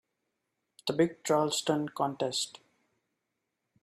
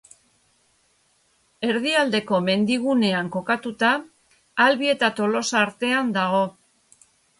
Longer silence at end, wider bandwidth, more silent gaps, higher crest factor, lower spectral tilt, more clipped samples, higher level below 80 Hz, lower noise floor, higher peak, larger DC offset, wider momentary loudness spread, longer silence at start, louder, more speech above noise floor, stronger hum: first, 1.35 s vs 0.9 s; first, 15 kHz vs 11.5 kHz; neither; about the same, 20 dB vs 18 dB; about the same, -4 dB/octave vs -4.5 dB/octave; neither; second, -76 dBFS vs -68 dBFS; first, -84 dBFS vs -64 dBFS; second, -14 dBFS vs -6 dBFS; neither; about the same, 8 LU vs 6 LU; second, 0.85 s vs 1.6 s; second, -31 LUFS vs -22 LUFS; first, 54 dB vs 43 dB; neither